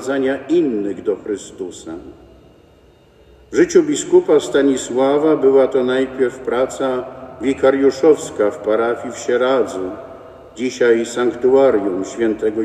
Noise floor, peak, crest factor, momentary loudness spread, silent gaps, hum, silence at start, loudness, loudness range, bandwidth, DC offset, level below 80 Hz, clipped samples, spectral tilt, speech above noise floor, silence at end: -49 dBFS; 0 dBFS; 16 dB; 13 LU; none; none; 0 s; -17 LUFS; 6 LU; 12.5 kHz; under 0.1%; -54 dBFS; under 0.1%; -4.5 dB/octave; 33 dB; 0 s